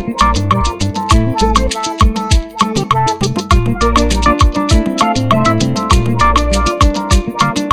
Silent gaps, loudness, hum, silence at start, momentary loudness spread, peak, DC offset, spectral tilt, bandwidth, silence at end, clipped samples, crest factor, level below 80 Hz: none; -13 LUFS; none; 0 s; 4 LU; 0 dBFS; under 0.1%; -5 dB/octave; 13.5 kHz; 0 s; 0.1%; 12 dB; -18 dBFS